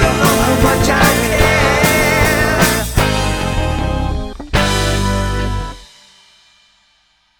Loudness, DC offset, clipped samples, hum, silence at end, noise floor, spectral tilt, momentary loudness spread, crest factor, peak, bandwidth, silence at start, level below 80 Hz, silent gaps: -14 LUFS; under 0.1%; under 0.1%; none; 1.55 s; -57 dBFS; -4.5 dB/octave; 9 LU; 14 dB; 0 dBFS; 19.5 kHz; 0 s; -22 dBFS; none